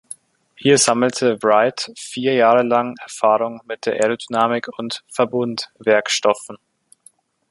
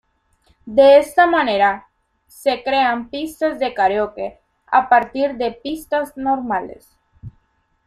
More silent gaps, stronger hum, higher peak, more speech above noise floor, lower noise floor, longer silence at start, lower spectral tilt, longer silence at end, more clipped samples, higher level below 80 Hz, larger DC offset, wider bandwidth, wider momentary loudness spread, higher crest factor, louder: neither; neither; about the same, -2 dBFS vs -2 dBFS; second, 36 dB vs 46 dB; second, -54 dBFS vs -63 dBFS; about the same, 0.6 s vs 0.65 s; about the same, -3.5 dB/octave vs -4.5 dB/octave; first, 0.95 s vs 0.55 s; neither; second, -66 dBFS vs -52 dBFS; neither; second, 11.5 kHz vs 13.5 kHz; about the same, 13 LU vs 14 LU; about the same, 18 dB vs 16 dB; about the same, -18 LUFS vs -17 LUFS